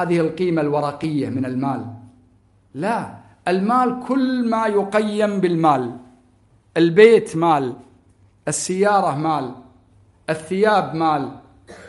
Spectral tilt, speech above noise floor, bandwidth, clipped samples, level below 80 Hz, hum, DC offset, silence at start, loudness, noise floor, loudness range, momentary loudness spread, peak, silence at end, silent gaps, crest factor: -5.5 dB/octave; 37 dB; 11.5 kHz; under 0.1%; -60 dBFS; none; under 0.1%; 0 s; -19 LUFS; -56 dBFS; 6 LU; 13 LU; 0 dBFS; 0 s; none; 20 dB